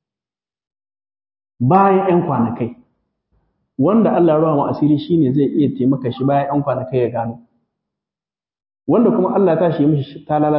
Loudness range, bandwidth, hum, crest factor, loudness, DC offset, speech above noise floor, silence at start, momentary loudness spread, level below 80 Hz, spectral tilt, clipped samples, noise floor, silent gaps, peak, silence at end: 4 LU; 5.6 kHz; none; 16 dB; -16 LUFS; under 0.1%; over 75 dB; 1.6 s; 8 LU; -54 dBFS; -13.5 dB/octave; under 0.1%; under -90 dBFS; none; -2 dBFS; 0 s